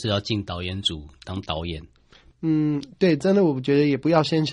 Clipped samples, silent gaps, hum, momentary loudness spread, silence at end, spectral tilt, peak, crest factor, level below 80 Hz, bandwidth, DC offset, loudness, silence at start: under 0.1%; none; none; 14 LU; 0 s; -6.5 dB/octave; -4 dBFS; 18 dB; -48 dBFS; 10.5 kHz; under 0.1%; -23 LUFS; 0 s